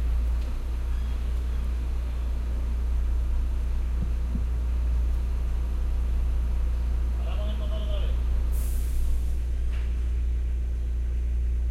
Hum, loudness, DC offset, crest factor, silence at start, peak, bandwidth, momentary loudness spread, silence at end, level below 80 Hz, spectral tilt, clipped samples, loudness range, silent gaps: none; -30 LUFS; under 0.1%; 10 dB; 0 s; -14 dBFS; 13 kHz; 2 LU; 0 s; -26 dBFS; -7 dB/octave; under 0.1%; 1 LU; none